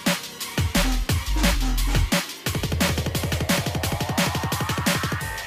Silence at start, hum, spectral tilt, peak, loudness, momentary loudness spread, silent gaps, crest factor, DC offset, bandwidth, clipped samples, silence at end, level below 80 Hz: 0 s; none; -4 dB/octave; -8 dBFS; -24 LUFS; 4 LU; none; 14 dB; under 0.1%; 16 kHz; under 0.1%; 0 s; -28 dBFS